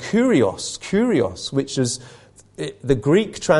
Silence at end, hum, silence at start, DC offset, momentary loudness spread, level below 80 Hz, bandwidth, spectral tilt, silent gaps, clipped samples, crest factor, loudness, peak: 0 s; none; 0 s; under 0.1%; 12 LU; -46 dBFS; 11.5 kHz; -5 dB/octave; none; under 0.1%; 18 dB; -20 LUFS; -2 dBFS